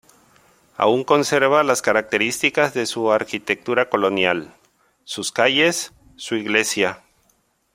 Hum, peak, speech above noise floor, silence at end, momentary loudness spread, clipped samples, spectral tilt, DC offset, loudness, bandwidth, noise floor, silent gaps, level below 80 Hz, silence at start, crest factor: none; 0 dBFS; 45 dB; 0.8 s; 11 LU; under 0.1%; -3 dB/octave; under 0.1%; -19 LUFS; 16.5 kHz; -64 dBFS; none; -62 dBFS; 0.8 s; 20 dB